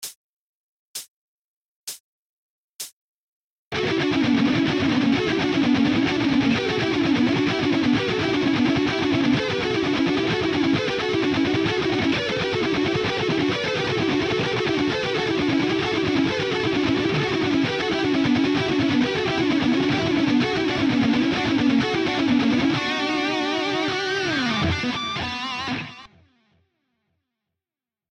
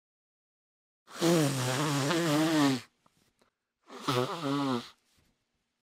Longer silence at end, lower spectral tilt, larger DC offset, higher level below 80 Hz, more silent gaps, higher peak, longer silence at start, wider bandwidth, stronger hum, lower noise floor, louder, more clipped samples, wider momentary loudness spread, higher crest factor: first, 2.05 s vs 0.95 s; about the same, -5.5 dB/octave vs -5 dB/octave; neither; first, -52 dBFS vs -74 dBFS; first, 0.15-0.94 s, 1.08-1.87 s, 2.00-2.79 s, 2.92-3.71 s vs none; first, -10 dBFS vs -14 dBFS; second, 0 s vs 1.1 s; second, 14 kHz vs 16 kHz; neither; first, under -90 dBFS vs -80 dBFS; first, -21 LUFS vs -29 LUFS; neither; second, 6 LU vs 10 LU; second, 12 dB vs 18 dB